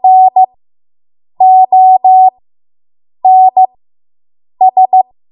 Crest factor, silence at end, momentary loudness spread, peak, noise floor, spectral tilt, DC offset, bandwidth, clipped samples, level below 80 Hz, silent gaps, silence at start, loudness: 8 dB; 0.3 s; 6 LU; 0 dBFS; under -90 dBFS; -9 dB/octave; under 0.1%; 1 kHz; under 0.1%; -70 dBFS; none; 0.05 s; -7 LUFS